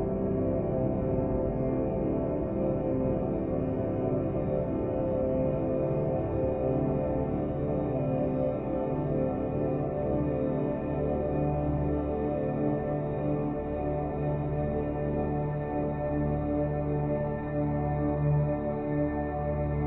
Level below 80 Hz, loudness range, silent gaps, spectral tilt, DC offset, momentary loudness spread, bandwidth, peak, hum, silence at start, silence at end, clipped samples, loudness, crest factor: -42 dBFS; 1 LU; none; -12.5 dB/octave; under 0.1%; 2 LU; 3.9 kHz; -16 dBFS; none; 0 s; 0 s; under 0.1%; -30 LUFS; 12 dB